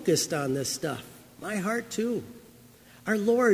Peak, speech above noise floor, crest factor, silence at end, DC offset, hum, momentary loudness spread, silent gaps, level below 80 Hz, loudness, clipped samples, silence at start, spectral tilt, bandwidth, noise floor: -10 dBFS; 26 dB; 18 dB; 0 s; under 0.1%; none; 17 LU; none; -66 dBFS; -29 LUFS; under 0.1%; 0 s; -4 dB/octave; 16 kHz; -53 dBFS